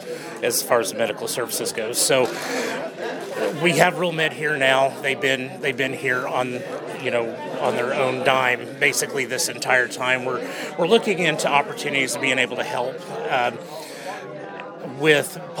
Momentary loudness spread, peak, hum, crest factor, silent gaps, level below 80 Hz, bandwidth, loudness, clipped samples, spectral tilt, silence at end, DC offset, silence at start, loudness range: 12 LU; 0 dBFS; none; 22 dB; none; -74 dBFS; 19 kHz; -21 LUFS; under 0.1%; -3 dB/octave; 0 s; under 0.1%; 0 s; 3 LU